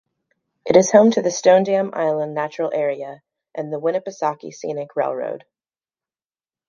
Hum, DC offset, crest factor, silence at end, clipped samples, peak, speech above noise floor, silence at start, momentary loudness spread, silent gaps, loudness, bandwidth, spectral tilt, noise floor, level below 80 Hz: none; under 0.1%; 20 dB; 1.3 s; under 0.1%; 0 dBFS; over 71 dB; 0.65 s; 17 LU; none; -19 LUFS; 7.4 kHz; -5 dB/octave; under -90 dBFS; -66 dBFS